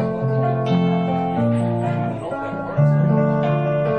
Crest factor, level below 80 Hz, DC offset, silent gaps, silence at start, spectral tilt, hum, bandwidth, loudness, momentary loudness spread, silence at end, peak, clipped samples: 12 dB; -50 dBFS; under 0.1%; none; 0 s; -9.5 dB/octave; none; 8.6 kHz; -20 LUFS; 8 LU; 0 s; -6 dBFS; under 0.1%